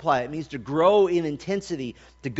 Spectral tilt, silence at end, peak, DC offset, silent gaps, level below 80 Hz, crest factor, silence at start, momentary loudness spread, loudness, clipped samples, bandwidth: -5 dB/octave; 0 s; -6 dBFS; under 0.1%; none; -56 dBFS; 18 dB; 0 s; 15 LU; -24 LUFS; under 0.1%; 8 kHz